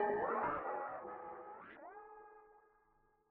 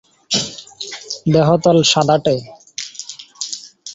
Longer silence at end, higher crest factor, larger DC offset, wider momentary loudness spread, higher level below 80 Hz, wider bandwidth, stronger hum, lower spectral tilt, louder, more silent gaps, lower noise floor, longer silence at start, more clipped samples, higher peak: first, 0.7 s vs 0 s; about the same, 18 dB vs 16 dB; neither; first, 21 LU vs 17 LU; second, -74 dBFS vs -54 dBFS; second, 4.1 kHz vs 8 kHz; neither; about the same, -4.5 dB/octave vs -4.5 dB/octave; second, -42 LUFS vs -16 LUFS; neither; first, -75 dBFS vs -35 dBFS; second, 0 s vs 0.3 s; neither; second, -26 dBFS vs -2 dBFS